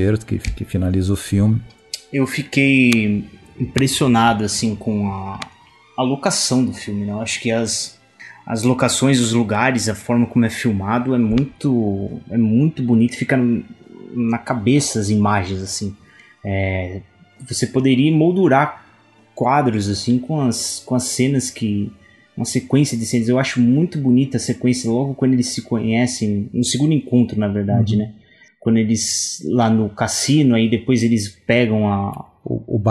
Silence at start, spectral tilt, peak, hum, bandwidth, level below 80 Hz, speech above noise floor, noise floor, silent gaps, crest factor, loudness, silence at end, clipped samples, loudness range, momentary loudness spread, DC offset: 0 s; -5 dB/octave; 0 dBFS; none; 12.5 kHz; -44 dBFS; 34 dB; -51 dBFS; none; 18 dB; -18 LUFS; 0 s; under 0.1%; 3 LU; 10 LU; under 0.1%